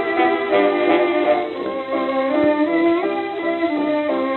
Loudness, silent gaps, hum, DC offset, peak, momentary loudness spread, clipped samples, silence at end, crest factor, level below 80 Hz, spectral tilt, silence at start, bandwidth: -19 LUFS; none; none; under 0.1%; -4 dBFS; 6 LU; under 0.1%; 0 s; 14 dB; -62 dBFS; -7.5 dB/octave; 0 s; 4.3 kHz